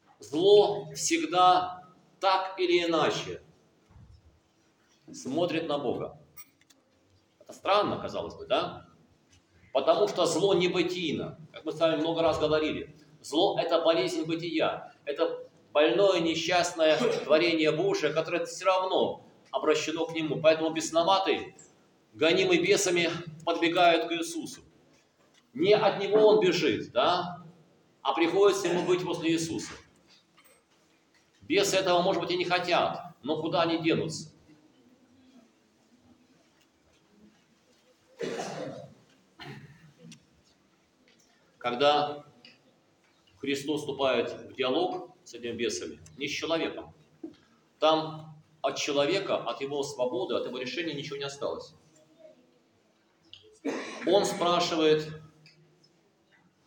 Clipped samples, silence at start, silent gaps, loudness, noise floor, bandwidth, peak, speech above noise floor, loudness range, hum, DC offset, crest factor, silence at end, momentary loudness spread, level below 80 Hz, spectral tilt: under 0.1%; 0.2 s; none; -27 LUFS; -67 dBFS; 17 kHz; -10 dBFS; 40 dB; 10 LU; none; under 0.1%; 20 dB; 1.4 s; 17 LU; -70 dBFS; -4 dB/octave